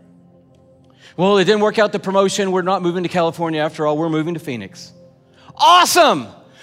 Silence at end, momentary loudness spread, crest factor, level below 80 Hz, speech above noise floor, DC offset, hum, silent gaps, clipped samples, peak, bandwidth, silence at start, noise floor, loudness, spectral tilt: 0.3 s; 16 LU; 16 dB; -66 dBFS; 33 dB; under 0.1%; none; none; under 0.1%; -2 dBFS; 16 kHz; 1.2 s; -49 dBFS; -16 LUFS; -4 dB/octave